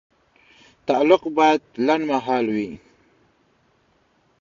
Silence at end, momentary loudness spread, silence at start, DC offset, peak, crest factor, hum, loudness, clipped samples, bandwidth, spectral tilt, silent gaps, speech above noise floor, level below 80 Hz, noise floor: 1.65 s; 14 LU; 0.85 s; under 0.1%; -2 dBFS; 20 dB; none; -20 LUFS; under 0.1%; 7.4 kHz; -5.5 dB/octave; none; 43 dB; -64 dBFS; -63 dBFS